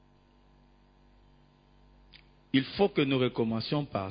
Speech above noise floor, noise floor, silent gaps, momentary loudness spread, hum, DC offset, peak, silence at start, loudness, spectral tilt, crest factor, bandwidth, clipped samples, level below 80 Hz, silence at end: 33 dB; -62 dBFS; none; 5 LU; none; under 0.1%; -12 dBFS; 2.55 s; -29 LUFS; -9.5 dB/octave; 22 dB; 5.2 kHz; under 0.1%; -60 dBFS; 0 s